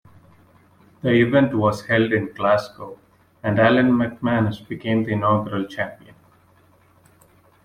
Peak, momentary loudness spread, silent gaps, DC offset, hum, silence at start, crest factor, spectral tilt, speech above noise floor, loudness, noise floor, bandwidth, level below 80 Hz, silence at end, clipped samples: -4 dBFS; 13 LU; none; under 0.1%; none; 1.05 s; 18 dB; -7.5 dB/octave; 36 dB; -20 LUFS; -56 dBFS; 11.5 kHz; -56 dBFS; 1.7 s; under 0.1%